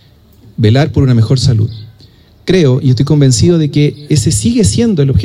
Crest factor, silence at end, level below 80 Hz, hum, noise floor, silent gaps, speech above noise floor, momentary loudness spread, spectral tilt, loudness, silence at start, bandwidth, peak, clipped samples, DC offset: 10 dB; 0 s; -32 dBFS; none; -41 dBFS; none; 32 dB; 6 LU; -6 dB/octave; -10 LUFS; 0.6 s; 14.5 kHz; 0 dBFS; under 0.1%; under 0.1%